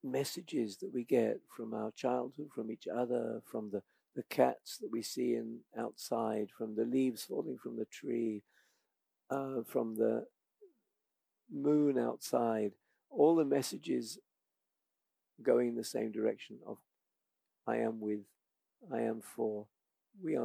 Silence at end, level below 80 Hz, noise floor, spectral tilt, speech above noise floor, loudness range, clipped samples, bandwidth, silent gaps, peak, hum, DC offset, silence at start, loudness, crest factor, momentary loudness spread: 0 s; under -90 dBFS; -88 dBFS; -5.5 dB/octave; 53 dB; 7 LU; under 0.1%; 16 kHz; none; -14 dBFS; none; under 0.1%; 0.05 s; -36 LUFS; 22 dB; 13 LU